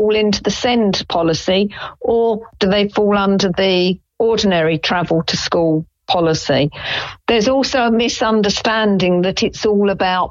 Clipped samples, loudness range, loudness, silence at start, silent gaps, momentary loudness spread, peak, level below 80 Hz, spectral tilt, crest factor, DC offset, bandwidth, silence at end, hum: under 0.1%; 1 LU; -16 LUFS; 0 s; none; 4 LU; -2 dBFS; -44 dBFS; -5 dB/octave; 12 dB; under 0.1%; 7.6 kHz; 0 s; none